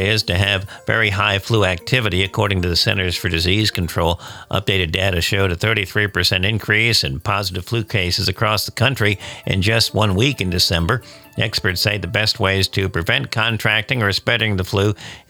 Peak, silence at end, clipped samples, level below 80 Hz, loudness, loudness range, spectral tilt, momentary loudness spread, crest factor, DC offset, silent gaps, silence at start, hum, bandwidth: -2 dBFS; 0.1 s; under 0.1%; -40 dBFS; -18 LUFS; 1 LU; -4.5 dB/octave; 5 LU; 16 dB; under 0.1%; none; 0 s; none; 19 kHz